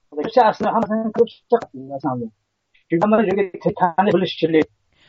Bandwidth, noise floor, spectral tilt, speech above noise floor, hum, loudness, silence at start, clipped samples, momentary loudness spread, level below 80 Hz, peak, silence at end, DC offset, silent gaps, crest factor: 7.4 kHz; -63 dBFS; -5 dB/octave; 45 dB; none; -19 LUFS; 0.1 s; under 0.1%; 10 LU; -60 dBFS; -2 dBFS; 0.45 s; under 0.1%; none; 16 dB